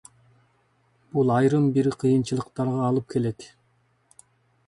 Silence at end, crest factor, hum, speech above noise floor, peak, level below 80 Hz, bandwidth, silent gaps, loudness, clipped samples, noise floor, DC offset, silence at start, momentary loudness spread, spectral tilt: 1.2 s; 16 dB; none; 43 dB; -8 dBFS; -62 dBFS; 11.5 kHz; none; -24 LUFS; under 0.1%; -66 dBFS; under 0.1%; 1.15 s; 9 LU; -8 dB/octave